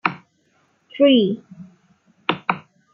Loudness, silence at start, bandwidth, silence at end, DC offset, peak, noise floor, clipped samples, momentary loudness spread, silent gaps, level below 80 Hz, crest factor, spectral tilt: -20 LUFS; 0.05 s; 5.8 kHz; 0.35 s; under 0.1%; -2 dBFS; -63 dBFS; under 0.1%; 20 LU; none; -72 dBFS; 20 dB; -8 dB/octave